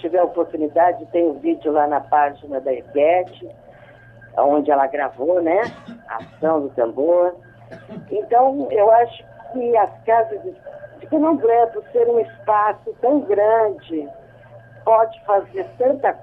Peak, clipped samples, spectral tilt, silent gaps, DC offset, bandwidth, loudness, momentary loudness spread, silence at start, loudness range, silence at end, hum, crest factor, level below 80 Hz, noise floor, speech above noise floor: -2 dBFS; under 0.1%; -8.5 dB/octave; none; under 0.1%; 5.6 kHz; -19 LUFS; 15 LU; 0.05 s; 2 LU; 0.05 s; none; 16 dB; -60 dBFS; -45 dBFS; 26 dB